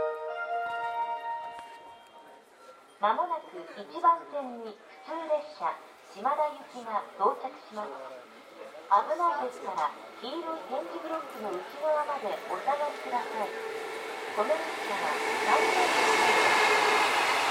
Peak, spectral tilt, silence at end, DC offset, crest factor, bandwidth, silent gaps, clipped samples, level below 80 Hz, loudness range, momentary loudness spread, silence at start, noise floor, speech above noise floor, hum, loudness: -12 dBFS; -1.5 dB/octave; 0 s; under 0.1%; 20 dB; 16 kHz; none; under 0.1%; -80 dBFS; 8 LU; 19 LU; 0 s; -54 dBFS; 24 dB; none; -29 LUFS